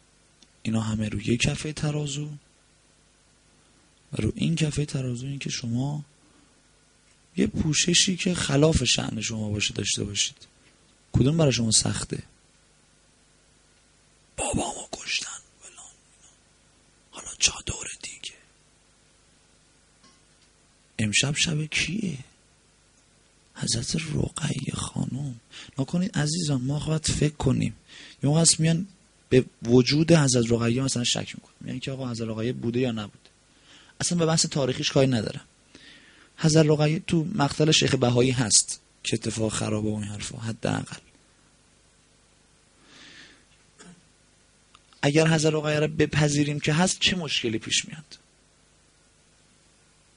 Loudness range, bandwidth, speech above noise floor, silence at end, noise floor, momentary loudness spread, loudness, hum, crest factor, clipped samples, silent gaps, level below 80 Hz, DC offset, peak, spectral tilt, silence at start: 11 LU; 10.5 kHz; 36 dB; 2 s; -60 dBFS; 17 LU; -25 LUFS; 50 Hz at -55 dBFS; 24 dB; under 0.1%; none; -50 dBFS; under 0.1%; -4 dBFS; -4 dB/octave; 0.65 s